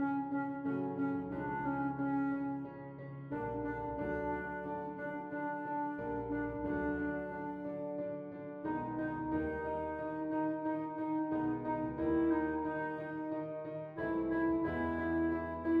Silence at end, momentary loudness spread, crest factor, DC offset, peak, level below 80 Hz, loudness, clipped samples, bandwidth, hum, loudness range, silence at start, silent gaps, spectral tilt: 0 s; 7 LU; 14 dB; under 0.1%; -22 dBFS; -58 dBFS; -38 LUFS; under 0.1%; 4.3 kHz; none; 3 LU; 0 s; none; -10 dB/octave